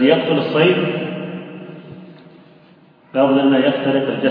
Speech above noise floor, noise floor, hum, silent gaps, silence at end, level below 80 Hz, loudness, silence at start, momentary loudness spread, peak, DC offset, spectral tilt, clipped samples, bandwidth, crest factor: 33 dB; -48 dBFS; none; none; 0 s; -68 dBFS; -16 LUFS; 0 s; 21 LU; 0 dBFS; under 0.1%; -9.5 dB/octave; under 0.1%; 5 kHz; 18 dB